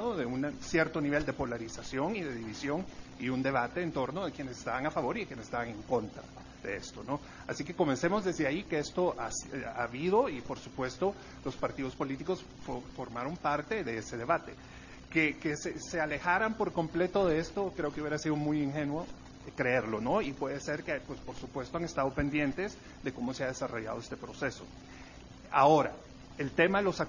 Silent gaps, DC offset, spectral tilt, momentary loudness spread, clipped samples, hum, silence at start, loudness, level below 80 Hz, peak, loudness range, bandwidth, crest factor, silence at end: none; under 0.1%; -5.5 dB/octave; 13 LU; under 0.1%; none; 0 s; -33 LUFS; -56 dBFS; -12 dBFS; 5 LU; 7.4 kHz; 22 dB; 0 s